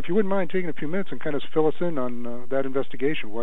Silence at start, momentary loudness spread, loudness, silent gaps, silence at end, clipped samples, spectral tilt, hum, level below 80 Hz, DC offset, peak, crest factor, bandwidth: 0 s; 6 LU; -27 LUFS; none; 0 s; under 0.1%; -8.5 dB/octave; none; -68 dBFS; 10%; -8 dBFS; 16 dB; 12.5 kHz